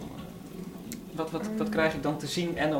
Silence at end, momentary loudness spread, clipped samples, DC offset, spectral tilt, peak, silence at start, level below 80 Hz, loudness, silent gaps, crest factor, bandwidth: 0 s; 15 LU; under 0.1%; under 0.1%; -5 dB/octave; -14 dBFS; 0 s; -56 dBFS; -31 LUFS; none; 18 dB; 18 kHz